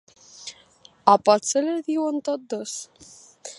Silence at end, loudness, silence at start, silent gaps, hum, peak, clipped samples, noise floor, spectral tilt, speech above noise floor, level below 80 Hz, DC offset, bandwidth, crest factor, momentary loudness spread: 0.05 s; -22 LUFS; 0.4 s; none; none; 0 dBFS; under 0.1%; -54 dBFS; -3.5 dB/octave; 32 dB; -74 dBFS; under 0.1%; 11.5 kHz; 24 dB; 22 LU